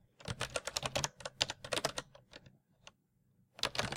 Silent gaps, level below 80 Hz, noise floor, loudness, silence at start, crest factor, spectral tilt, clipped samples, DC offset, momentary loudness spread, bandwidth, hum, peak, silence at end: none; -62 dBFS; -74 dBFS; -38 LUFS; 0.2 s; 32 dB; -2 dB/octave; under 0.1%; under 0.1%; 20 LU; 16.5 kHz; none; -10 dBFS; 0 s